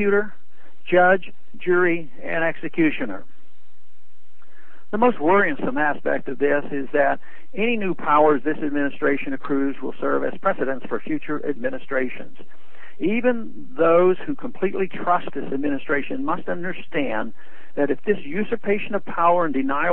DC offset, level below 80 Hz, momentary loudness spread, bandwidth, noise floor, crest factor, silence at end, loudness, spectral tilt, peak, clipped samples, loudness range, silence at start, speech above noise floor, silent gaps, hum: 7%; -62 dBFS; 11 LU; 4.1 kHz; -64 dBFS; 18 dB; 0 s; -22 LUFS; -9.5 dB/octave; -4 dBFS; under 0.1%; 4 LU; 0 s; 42 dB; none; none